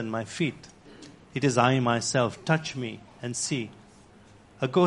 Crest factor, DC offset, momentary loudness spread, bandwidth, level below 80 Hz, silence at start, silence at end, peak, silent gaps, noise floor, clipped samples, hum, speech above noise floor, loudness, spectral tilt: 22 dB; under 0.1%; 20 LU; 11.5 kHz; -62 dBFS; 0 s; 0 s; -6 dBFS; none; -54 dBFS; under 0.1%; none; 27 dB; -27 LUFS; -5 dB/octave